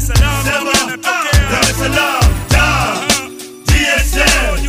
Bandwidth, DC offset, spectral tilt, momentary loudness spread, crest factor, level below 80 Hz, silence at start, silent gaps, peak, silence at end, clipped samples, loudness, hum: 15.5 kHz; under 0.1%; -3.5 dB/octave; 4 LU; 12 dB; -18 dBFS; 0 s; none; 0 dBFS; 0 s; under 0.1%; -13 LUFS; none